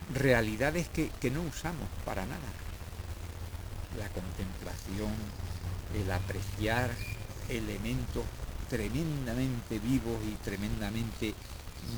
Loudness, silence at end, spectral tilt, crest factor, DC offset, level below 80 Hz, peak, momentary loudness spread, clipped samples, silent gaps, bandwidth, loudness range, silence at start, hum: -35 LUFS; 0 s; -5.5 dB/octave; 24 dB; 0.2%; -42 dBFS; -12 dBFS; 11 LU; under 0.1%; none; over 20 kHz; 5 LU; 0 s; none